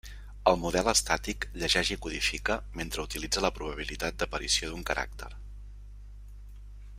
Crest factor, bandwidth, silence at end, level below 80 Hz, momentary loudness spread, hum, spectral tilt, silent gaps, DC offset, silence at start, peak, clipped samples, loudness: 24 dB; 16 kHz; 0 s; -42 dBFS; 24 LU; 50 Hz at -40 dBFS; -2.5 dB/octave; none; under 0.1%; 0.05 s; -8 dBFS; under 0.1%; -29 LUFS